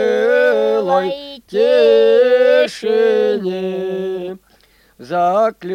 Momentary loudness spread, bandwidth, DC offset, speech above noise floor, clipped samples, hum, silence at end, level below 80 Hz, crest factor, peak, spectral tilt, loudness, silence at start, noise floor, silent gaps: 12 LU; 10.5 kHz; under 0.1%; 37 dB; under 0.1%; none; 0 s; -60 dBFS; 14 dB; -2 dBFS; -5.5 dB/octave; -15 LUFS; 0 s; -52 dBFS; none